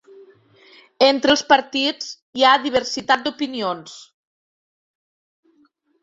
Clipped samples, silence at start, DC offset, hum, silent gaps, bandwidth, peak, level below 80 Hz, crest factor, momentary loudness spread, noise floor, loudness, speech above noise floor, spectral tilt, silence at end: under 0.1%; 1 s; under 0.1%; none; 2.22-2.33 s; 7.8 kHz; -2 dBFS; -62 dBFS; 20 dB; 15 LU; -61 dBFS; -18 LUFS; 42 dB; -2.5 dB/octave; 2 s